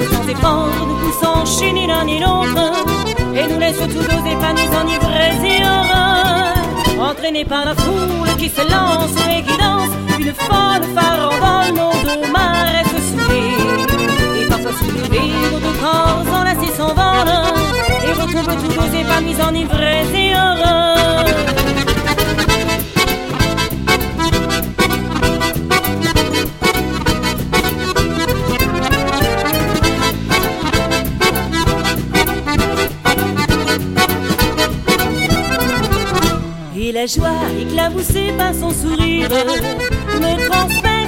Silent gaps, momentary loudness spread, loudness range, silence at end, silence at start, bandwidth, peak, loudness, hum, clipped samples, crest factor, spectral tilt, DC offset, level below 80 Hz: none; 4 LU; 2 LU; 0 s; 0 s; 17 kHz; 0 dBFS; -15 LUFS; none; under 0.1%; 14 dB; -4.5 dB/octave; under 0.1%; -26 dBFS